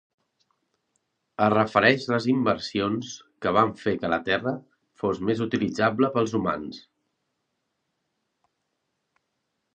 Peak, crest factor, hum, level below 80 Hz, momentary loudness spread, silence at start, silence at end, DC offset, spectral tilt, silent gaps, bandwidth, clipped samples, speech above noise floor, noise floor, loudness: -2 dBFS; 24 dB; none; -60 dBFS; 12 LU; 1.4 s; 2.95 s; under 0.1%; -6 dB/octave; none; 9 kHz; under 0.1%; 54 dB; -78 dBFS; -24 LUFS